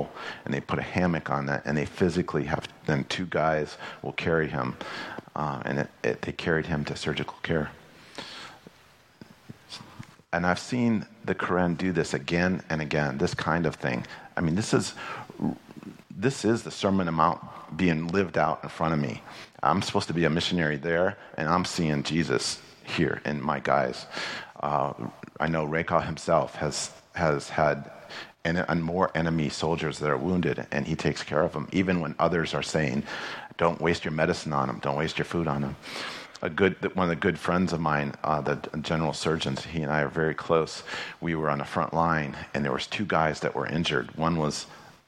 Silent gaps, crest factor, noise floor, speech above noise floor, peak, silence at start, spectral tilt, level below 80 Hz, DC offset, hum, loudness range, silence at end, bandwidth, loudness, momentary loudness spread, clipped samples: none; 22 dB; -57 dBFS; 30 dB; -6 dBFS; 0 s; -5.5 dB/octave; -52 dBFS; under 0.1%; none; 3 LU; 0.15 s; 12 kHz; -28 LUFS; 10 LU; under 0.1%